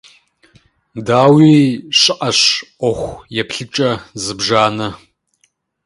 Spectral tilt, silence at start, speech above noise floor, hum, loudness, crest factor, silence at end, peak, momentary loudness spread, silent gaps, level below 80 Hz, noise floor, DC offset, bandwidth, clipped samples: -4.5 dB/octave; 0.95 s; 48 dB; none; -13 LUFS; 16 dB; 0.9 s; 0 dBFS; 15 LU; none; -48 dBFS; -62 dBFS; under 0.1%; 11.5 kHz; under 0.1%